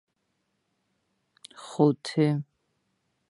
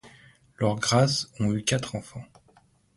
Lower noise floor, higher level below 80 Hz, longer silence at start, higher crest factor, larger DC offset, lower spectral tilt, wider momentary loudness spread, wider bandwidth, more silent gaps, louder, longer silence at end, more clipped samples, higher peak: first, -77 dBFS vs -61 dBFS; second, -78 dBFS vs -56 dBFS; first, 1.6 s vs 0.05 s; about the same, 24 dB vs 20 dB; neither; first, -7 dB/octave vs -4.5 dB/octave; first, 21 LU vs 16 LU; about the same, 11.5 kHz vs 11.5 kHz; neither; about the same, -26 LUFS vs -26 LUFS; first, 0.85 s vs 0.7 s; neither; about the same, -8 dBFS vs -8 dBFS